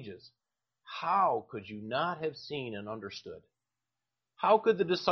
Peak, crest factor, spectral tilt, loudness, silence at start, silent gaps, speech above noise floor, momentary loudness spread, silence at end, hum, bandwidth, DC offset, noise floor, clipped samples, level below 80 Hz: -12 dBFS; 22 dB; -3 dB/octave; -31 LUFS; 0 s; none; 58 dB; 20 LU; 0 s; none; 6.4 kHz; under 0.1%; -90 dBFS; under 0.1%; -76 dBFS